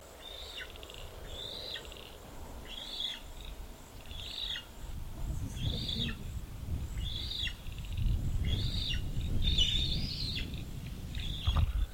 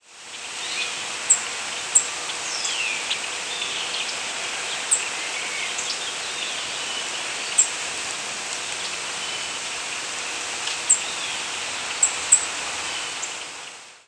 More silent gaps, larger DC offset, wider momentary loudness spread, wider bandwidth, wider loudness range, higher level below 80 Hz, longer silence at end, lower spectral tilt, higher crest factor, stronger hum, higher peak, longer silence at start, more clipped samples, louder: neither; neither; first, 15 LU vs 8 LU; first, 16.5 kHz vs 11 kHz; first, 8 LU vs 3 LU; first, -38 dBFS vs -68 dBFS; about the same, 0 s vs 0.05 s; first, -4.5 dB/octave vs 2 dB/octave; second, 20 dB vs 26 dB; neither; second, -16 dBFS vs -2 dBFS; about the same, 0 s vs 0.05 s; neither; second, -36 LUFS vs -23 LUFS